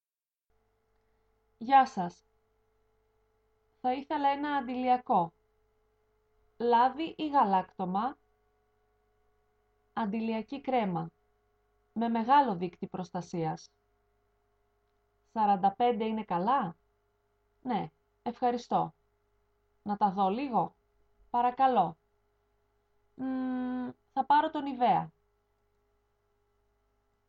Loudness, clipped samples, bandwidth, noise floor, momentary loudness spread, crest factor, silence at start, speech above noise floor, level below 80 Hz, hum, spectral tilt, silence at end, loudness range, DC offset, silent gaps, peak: -30 LUFS; under 0.1%; 7.4 kHz; under -90 dBFS; 13 LU; 22 dB; 1.6 s; over 61 dB; -72 dBFS; 50 Hz at -65 dBFS; -7 dB/octave; 2.2 s; 5 LU; under 0.1%; none; -12 dBFS